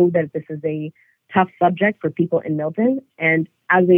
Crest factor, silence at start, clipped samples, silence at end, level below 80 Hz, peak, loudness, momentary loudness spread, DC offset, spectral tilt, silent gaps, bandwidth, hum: 16 dB; 0 s; under 0.1%; 0 s; -68 dBFS; -2 dBFS; -20 LUFS; 9 LU; under 0.1%; -10 dB/octave; none; 3.6 kHz; none